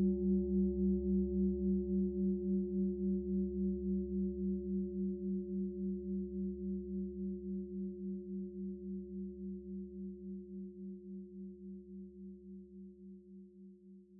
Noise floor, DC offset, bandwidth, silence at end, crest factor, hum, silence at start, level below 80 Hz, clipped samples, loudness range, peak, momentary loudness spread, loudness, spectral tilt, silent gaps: -58 dBFS; under 0.1%; 0.8 kHz; 0 s; 14 dB; none; 0 s; -52 dBFS; under 0.1%; 14 LU; -24 dBFS; 19 LU; -39 LUFS; -4 dB/octave; none